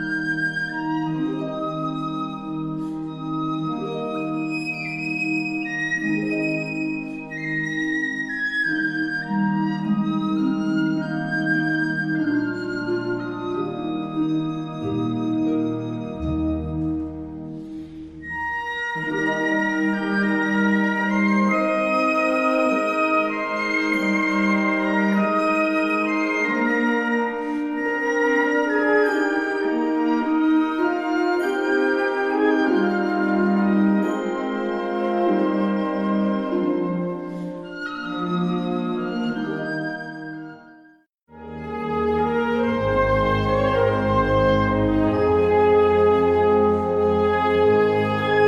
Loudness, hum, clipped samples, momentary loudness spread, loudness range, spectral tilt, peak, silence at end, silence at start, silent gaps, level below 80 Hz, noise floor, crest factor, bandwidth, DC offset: -22 LUFS; none; under 0.1%; 9 LU; 8 LU; -7 dB/octave; -8 dBFS; 0 s; 0 s; none; -44 dBFS; -52 dBFS; 14 dB; 10 kHz; under 0.1%